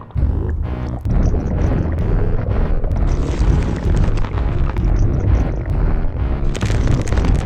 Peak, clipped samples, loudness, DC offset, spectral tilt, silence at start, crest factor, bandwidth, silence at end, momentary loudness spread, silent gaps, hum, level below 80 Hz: -2 dBFS; under 0.1%; -19 LUFS; under 0.1%; -7.5 dB/octave; 0 s; 12 dB; 8.8 kHz; 0 s; 4 LU; none; none; -18 dBFS